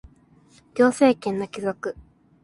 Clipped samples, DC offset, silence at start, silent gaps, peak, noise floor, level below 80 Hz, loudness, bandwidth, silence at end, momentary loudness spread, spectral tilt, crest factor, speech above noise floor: under 0.1%; under 0.1%; 0.75 s; none; -4 dBFS; -55 dBFS; -56 dBFS; -22 LUFS; 11.5 kHz; 0.5 s; 16 LU; -5.5 dB/octave; 20 dB; 34 dB